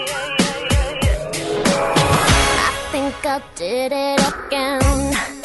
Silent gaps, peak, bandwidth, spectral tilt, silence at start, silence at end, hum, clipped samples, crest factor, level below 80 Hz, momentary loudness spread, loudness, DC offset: none; -2 dBFS; 12 kHz; -4 dB/octave; 0 s; 0 s; none; under 0.1%; 16 dB; -26 dBFS; 8 LU; -18 LUFS; under 0.1%